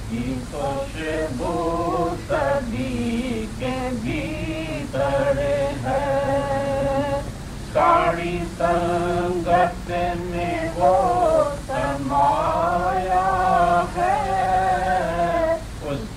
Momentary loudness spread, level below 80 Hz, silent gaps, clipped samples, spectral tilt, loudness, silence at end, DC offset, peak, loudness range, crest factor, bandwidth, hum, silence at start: 9 LU; -36 dBFS; none; under 0.1%; -6 dB/octave; -22 LUFS; 0 s; under 0.1%; -6 dBFS; 4 LU; 16 dB; 15.5 kHz; none; 0 s